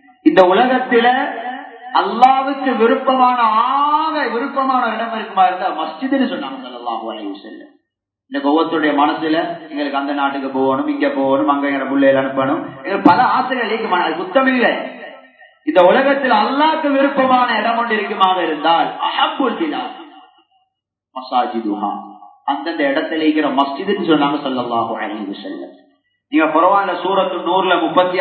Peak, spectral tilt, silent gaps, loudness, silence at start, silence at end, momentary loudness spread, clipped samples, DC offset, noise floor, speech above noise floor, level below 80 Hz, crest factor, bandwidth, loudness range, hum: 0 dBFS; -7 dB/octave; none; -16 LUFS; 0.25 s; 0 s; 13 LU; under 0.1%; under 0.1%; -75 dBFS; 60 dB; -66 dBFS; 16 dB; 6 kHz; 6 LU; none